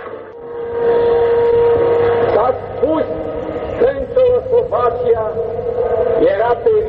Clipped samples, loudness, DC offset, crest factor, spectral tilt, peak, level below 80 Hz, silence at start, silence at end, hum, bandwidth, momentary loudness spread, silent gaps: under 0.1%; -15 LUFS; under 0.1%; 12 dB; -9 dB/octave; -4 dBFS; -40 dBFS; 0 s; 0 s; none; 4.5 kHz; 10 LU; none